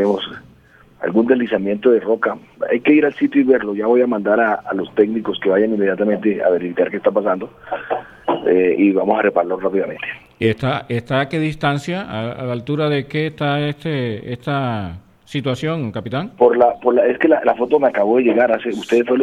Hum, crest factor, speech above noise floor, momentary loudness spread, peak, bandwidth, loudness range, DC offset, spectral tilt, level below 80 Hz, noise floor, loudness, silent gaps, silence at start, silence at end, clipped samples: none; 16 dB; 31 dB; 10 LU; 0 dBFS; 10.5 kHz; 5 LU; under 0.1%; -7.5 dB/octave; -54 dBFS; -48 dBFS; -18 LUFS; none; 0 s; 0 s; under 0.1%